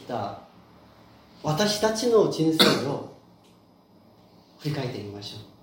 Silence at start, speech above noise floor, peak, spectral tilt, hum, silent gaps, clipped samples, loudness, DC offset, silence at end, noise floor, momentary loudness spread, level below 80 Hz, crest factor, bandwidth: 0 s; 32 dB; -2 dBFS; -4.5 dB/octave; none; none; under 0.1%; -24 LUFS; under 0.1%; 0.15 s; -56 dBFS; 18 LU; -64 dBFS; 24 dB; 16.5 kHz